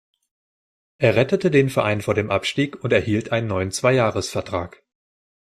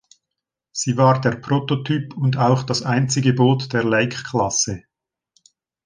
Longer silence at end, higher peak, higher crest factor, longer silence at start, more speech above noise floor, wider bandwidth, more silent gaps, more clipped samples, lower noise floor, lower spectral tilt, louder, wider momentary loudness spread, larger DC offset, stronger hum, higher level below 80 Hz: second, 0.9 s vs 1.05 s; about the same, -2 dBFS vs -2 dBFS; about the same, 20 dB vs 18 dB; first, 1 s vs 0.75 s; first, over 70 dB vs 64 dB; first, 14 kHz vs 10 kHz; neither; neither; first, under -90 dBFS vs -83 dBFS; about the same, -5.5 dB/octave vs -5 dB/octave; about the same, -21 LUFS vs -19 LUFS; about the same, 8 LU vs 7 LU; neither; neither; about the same, -56 dBFS vs -54 dBFS